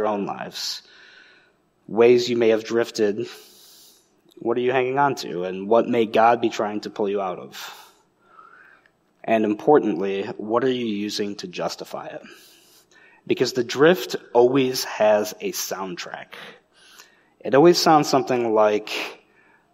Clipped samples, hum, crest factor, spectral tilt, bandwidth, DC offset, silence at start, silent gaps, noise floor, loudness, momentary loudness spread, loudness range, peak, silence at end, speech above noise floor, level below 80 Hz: under 0.1%; none; 20 dB; -4.5 dB/octave; 16 kHz; under 0.1%; 0 s; none; -61 dBFS; -21 LUFS; 17 LU; 5 LU; -4 dBFS; 0.6 s; 40 dB; -74 dBFS